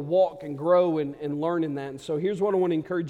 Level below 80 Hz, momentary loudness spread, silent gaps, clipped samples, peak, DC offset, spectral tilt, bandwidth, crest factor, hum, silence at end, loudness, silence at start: -66 dBFS; 9 LU; none; under 0.1%; -8 dBFS; under 0.1%; -8 dB/octave; 10 kHz; 16 dB; none; 0 s; -26 LUFS; 0 s